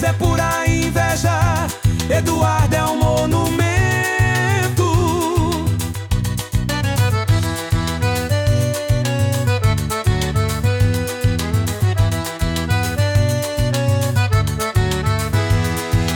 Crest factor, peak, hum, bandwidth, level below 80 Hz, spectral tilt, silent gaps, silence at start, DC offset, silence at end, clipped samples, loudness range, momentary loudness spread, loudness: 12 dB; -6 dBFS; none; 18.5 kHz; -30 dBFS; -5.5 dB/octave; none; 0 s; under 0.1%; 0 s; under 0.1%; 2 LU; 4 LU; -18 LUFS